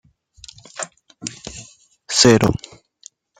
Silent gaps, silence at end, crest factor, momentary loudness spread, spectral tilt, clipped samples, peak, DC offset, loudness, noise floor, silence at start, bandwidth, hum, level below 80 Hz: none; 0.85 s; 22 dB; 23 LU; -4 dB/octave; under 0.1%; 0 dBFS; under 0.1%; -15 LUFS; -48 dBFS; 0.75 s; 16 kHz; none; -46 dBFS